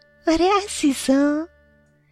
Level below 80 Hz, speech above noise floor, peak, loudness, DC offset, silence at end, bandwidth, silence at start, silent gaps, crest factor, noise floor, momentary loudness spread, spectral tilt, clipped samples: -46 dBFS; 38 dB; -8 dBFS; -20 LUFS; under 0.1%; 0.65 s; 14 kHz; 0.25 s; none; 14 dB; -57 dBFS; 7 LU; -3 dB/octave; under 0.1%